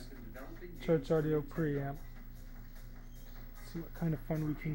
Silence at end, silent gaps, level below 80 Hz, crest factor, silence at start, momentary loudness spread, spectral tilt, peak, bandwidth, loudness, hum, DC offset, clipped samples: 0 s; none; -48 dBFS; 18 dB; 0 s; 21 LU; -8 dB/octave; -20 dBFS; 16 kHz; -36 LUFS; none; under 0.1%; under 0.1%